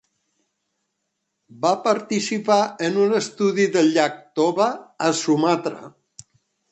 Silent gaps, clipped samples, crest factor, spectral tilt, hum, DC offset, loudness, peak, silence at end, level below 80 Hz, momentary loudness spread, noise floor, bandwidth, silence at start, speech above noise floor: none; under 0.1%; 18 dB; -4.5 dB/octave; none; under 0.1%; -21 LUFS; -4 dBFS; 0.85 s; -70 dBFS; 6 LU; -77 dBFS; 8.8 kHz; 1.55 s; 56 dB